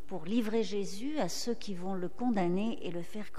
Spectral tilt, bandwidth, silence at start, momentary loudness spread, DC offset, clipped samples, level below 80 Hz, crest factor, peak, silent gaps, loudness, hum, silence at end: -5.5 dB/octave; 15.5 kHz; 0.1 s; 7 LU; 2%; under 0.1%; -64 dBFS; 14 dB; -20 dBFS; none; -35 LUFS; none; 0 s